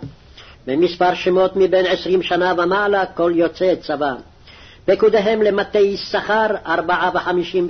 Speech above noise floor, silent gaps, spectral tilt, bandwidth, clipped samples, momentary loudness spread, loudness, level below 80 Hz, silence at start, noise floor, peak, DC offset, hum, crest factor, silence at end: 26 dB; none; -6 dB/octave; 6.4 kHz; under 0.1%; 7 LU; -17 LUFS; -48 dBFS; 0 s; -43 dBFS; -6 dBFS; under 0.1%; none; 12 dB; 0 s